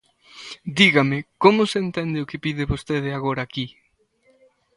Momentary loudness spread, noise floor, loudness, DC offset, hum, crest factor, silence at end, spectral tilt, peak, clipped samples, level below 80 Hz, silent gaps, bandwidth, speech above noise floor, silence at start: 17 LU; -62 dBFS; -21 LUFS; under 0.1%; none; 22 dB; 1.1 s; -5.5 dB/octave; 0 dBFS; under 0.1%; -46 dBFS; none; 11.5 kHz; 42 dB; 0.35 s